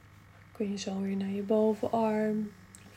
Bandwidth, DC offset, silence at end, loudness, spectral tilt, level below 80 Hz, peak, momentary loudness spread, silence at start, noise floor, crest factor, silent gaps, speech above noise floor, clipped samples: 14 kHz; under 0.1%; 0.05 s; -31 LUFS; -6.5 dB/octave; -68 dBFS; -16 dBFS; 8 LU; 0.1 s; -55 dBFS; 16 dB; none; 25 dB; under 0.1%